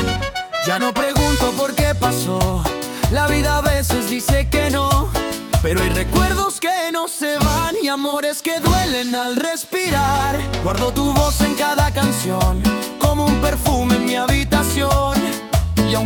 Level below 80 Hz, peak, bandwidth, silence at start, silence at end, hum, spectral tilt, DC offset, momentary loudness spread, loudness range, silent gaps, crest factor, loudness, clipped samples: -26 dBFS; -4 dBFS; 19 kHz; 0 s; 0 s; none; -4.5 dB/octave; under 0.1%; 4 LU; 1 LU; none; 14 dB; -18 LUFS; under 0.1%